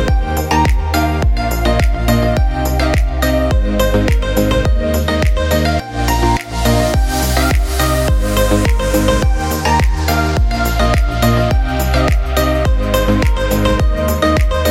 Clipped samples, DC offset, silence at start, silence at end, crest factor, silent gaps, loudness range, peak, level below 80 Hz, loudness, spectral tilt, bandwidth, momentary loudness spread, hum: under 0.1%; under 0.1%; 0 s; 0 s; 12 dB; none; 1 LU; 0 dBFS; -16 dBFS; -15 LUFS; -5.5 dB/octave; 16.5 kHz; 2 LU; none